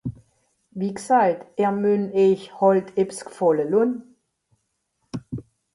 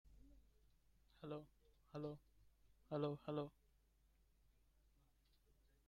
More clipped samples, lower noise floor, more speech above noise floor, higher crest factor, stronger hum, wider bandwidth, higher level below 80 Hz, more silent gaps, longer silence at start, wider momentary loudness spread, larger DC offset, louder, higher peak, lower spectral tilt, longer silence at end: neither; second, -73 dBFS vs -77 dBFS; first, 52 dB vs 29 dB; about the same, 18 dB vs 22 dB; neither; second, 11.5 kHz vs 14 kHz; first, -58 dBFS vs -74 dBFS; neither; about the same, 0.05 s vs 0.05 s; first, 17 LU vs 14 LU; neither; first, -21 LUFS vs -50 LUFS; first, -6 dBFS vs -32 dBFS; second, -7 dB/octave vs -8.5 dB/octave; second, 0.35 s vs 2.4 s